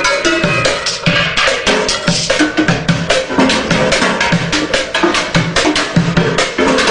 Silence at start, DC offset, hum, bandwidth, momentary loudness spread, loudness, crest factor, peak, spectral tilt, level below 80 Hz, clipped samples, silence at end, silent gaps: 0 s; under 0.1%; none; 10.5 kHz; 2 LU; -12 LUFS; 12 dB; 0 dBFS; -4 dB/octave; -34 dBFS; under 0.1%; 0 s; none